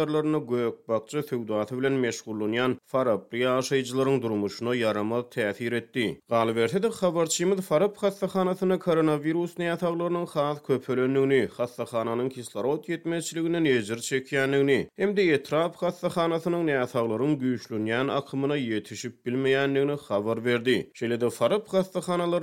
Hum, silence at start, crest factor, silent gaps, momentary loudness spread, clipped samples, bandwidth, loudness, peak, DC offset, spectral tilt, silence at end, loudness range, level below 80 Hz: none; 0 s; 16 dB; none; 6 LU; under 0.1%; 16.5 kHz; -27 LUFS; -10 dBFS; under 0.1%; -5.5 dB/octave; 0 s; 2 LU; -70 dBFS